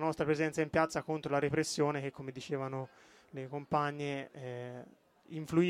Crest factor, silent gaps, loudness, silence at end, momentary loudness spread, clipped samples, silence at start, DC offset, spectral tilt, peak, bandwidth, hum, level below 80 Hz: 20 dB; none; -35 LUFS; 0 s; 15 LU; under 0.1%; 0 s; under 0.1%; -5.5 dB/octave; -14 dBFS; 14.5 kHz; none; -66 dBFS